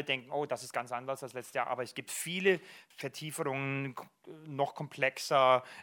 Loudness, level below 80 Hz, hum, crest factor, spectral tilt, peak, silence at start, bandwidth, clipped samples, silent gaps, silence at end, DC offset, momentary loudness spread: -34 LUFS; -86 dBFS; none; 22 dB; -4 dB/octave; -12 dBFS; 0 s; 19.5 kHz; under 0.1%; none; 0 s; under 0.1%; 15 LU